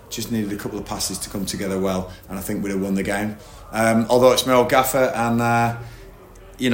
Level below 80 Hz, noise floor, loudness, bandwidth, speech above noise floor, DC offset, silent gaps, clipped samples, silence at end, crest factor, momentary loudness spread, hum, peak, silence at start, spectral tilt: -44 dBFS; -43 dBFS; -21 LUFS; 16.5 kHz; 22 dB; under 0.1%; none; under 0.1%; 0 s; 20 dB; 14 LU; none; -2 dBFS; 0 s; -4.5 dB/octave